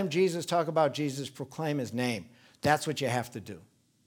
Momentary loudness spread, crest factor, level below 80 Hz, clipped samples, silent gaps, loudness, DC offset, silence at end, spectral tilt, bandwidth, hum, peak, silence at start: 13 LU; 22 dB; -70 dBFS; under 0.1%; none; -30 LUFS; under 0.1%; 0.45 s; -5 dB/octave; 19.5 kHz; none; -8 dBFS; 0 s